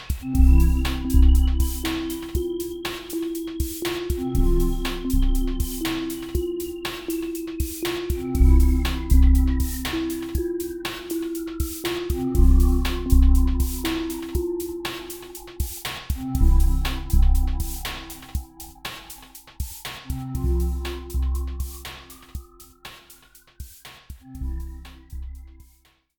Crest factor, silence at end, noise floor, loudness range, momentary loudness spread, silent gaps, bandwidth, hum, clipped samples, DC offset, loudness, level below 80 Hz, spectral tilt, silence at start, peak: 18 dB; 0.7 s; -59 dBFS; 11 LU; 20 LU; none; 19 kHz; none; under 0.1%; under 0.1%; -25 LUFS; -22 dBFS; -6 dB/octave; 0 s; -4 dBFS